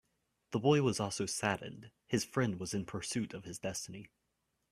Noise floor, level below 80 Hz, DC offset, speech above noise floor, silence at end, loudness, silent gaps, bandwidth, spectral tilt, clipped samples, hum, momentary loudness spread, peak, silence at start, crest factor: -82 dBFS; -68 dBFS; under 0.1%; 47 dB; 0.65 s; -35 LUFS; none; 15 kHz; -4.5 dB/octave; under 0.1%; none; 14 LU; -14 dBFS; 0.5 s; 22 dB